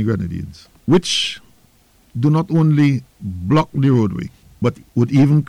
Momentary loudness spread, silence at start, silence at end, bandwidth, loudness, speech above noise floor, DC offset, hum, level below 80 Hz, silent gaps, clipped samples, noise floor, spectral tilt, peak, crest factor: 16 LU; 0 s; 0 s; 11 kHz; -17 LUFS; 37 dB; under 0.1%; none; -46 dBFS; none; under 0.1%; -54 dBFS; -6.5 dB/octave; -6 dBFS; 12 dB